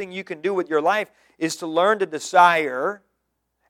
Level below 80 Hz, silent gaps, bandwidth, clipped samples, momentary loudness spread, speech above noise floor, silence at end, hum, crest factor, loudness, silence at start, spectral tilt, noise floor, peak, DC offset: -78 dBFS; none; 16.5 kHz; under 0.1%; 13 LU; 54 dB; 0.75 s; none; 20 dB; -21 LUFS; 0 s; -3.5 dB/octave; -75 dBFS; -2 dBFS; under 0.1%